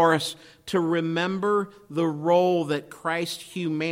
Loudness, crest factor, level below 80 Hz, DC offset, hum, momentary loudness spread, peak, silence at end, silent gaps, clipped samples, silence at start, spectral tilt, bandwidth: -25 LUFS; 18 dB; -68 dBFS; under 0.1%; none; 10 LU; -8 dBFS; 0 s; none; under 0.1%; 0 s; -5.5 dB/octave; 16.5 kHz